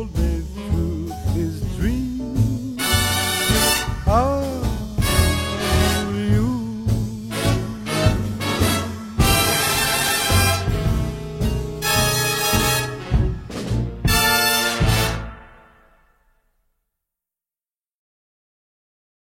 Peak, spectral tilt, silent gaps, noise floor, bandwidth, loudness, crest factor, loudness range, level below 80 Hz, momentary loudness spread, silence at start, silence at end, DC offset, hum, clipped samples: -2 dBFS; -4 dB/octave; none; under -90 dBFS; 16.5 kHz; -20 LUFS; 18 dB; 3 LU; -28 dBFS; 9 LU; 0 s; 3.9 s; under 0.1%; none; under 0.1%